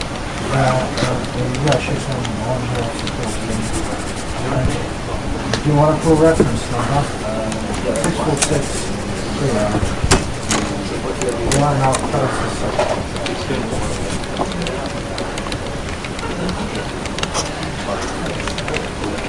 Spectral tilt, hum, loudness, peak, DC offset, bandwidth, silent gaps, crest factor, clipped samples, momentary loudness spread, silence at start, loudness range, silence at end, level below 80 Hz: -5 dB/octave; none; -19 LUFS; -2 dBFS; 1%; 11.5 kHz; none; 16 dB; under 0.1%; 8 LU; 0 s; 6 LU; 0 s; -30 dBFS